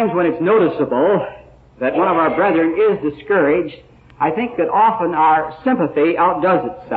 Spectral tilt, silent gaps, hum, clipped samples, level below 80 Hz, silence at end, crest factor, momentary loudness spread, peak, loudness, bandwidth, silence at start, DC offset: -10 dB/octave; none; none; under 0.1%; -52 dBFS; 0 s; 12 dB; 6 LU; -4 dBFS; -16 LUFS; 4.6 kHz; 0 s; under 0.1%